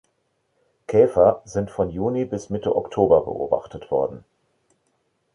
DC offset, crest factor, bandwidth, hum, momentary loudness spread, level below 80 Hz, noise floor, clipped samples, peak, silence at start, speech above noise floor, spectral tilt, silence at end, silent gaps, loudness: under 0.1%; 20 dB; 11 kHz; none; 10 LU; -50 dBFS; -70 dBFS; under 0.1%; -2 dBFS; 0.9 s; 50 dB; -7.5 dB/octave; 1.15 s; none; -22 LUFS